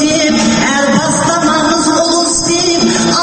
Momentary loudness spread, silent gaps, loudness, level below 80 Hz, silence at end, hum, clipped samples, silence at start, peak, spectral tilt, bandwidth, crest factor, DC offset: 1 LU; none; -10 LUFS; -38 dBFS; 0 s; none; under 0.1%; 0 s; 0 dBFS; -3 dB/octave; 9 kHz; 10 dB; under 0.1%